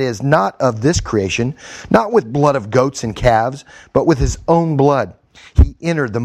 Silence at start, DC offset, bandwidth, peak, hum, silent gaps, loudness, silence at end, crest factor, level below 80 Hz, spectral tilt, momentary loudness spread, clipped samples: 0 s; under 0.1%; 12 kHz; 0 dBFS; none; none; -16 LUFS; 0 s; 16 dB; -26 dBFS; -6 dB/octave; 6 LU; 0.1%